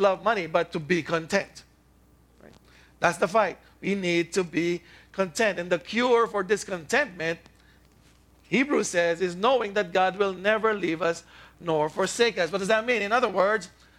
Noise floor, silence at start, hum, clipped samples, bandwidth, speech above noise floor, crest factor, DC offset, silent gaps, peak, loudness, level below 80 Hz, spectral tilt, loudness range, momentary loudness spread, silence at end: -59 dBFS; 0 s; none; under 0.1%; 15 kHz; 34 dB; 22 dB; under 0.1%; none; -6 dBFS; -25 LUFS; -60 dBFS; -4 dB/octave; 3 LU; 7 LU; 0.3 s